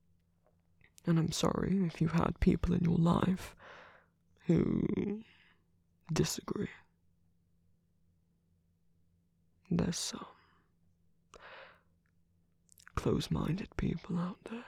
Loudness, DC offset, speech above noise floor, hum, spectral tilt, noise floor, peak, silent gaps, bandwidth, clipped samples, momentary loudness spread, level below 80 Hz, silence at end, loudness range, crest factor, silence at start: -34 LUFS; under 0.1%; 41 dB; none; -6 dB/octave; -73 dBFS; -14 dBFS; none; 14.5 kHz; under 0.1%; 18 LU; -50 dBFS; 0 s; 11 LU; 22 dB; 1.05 s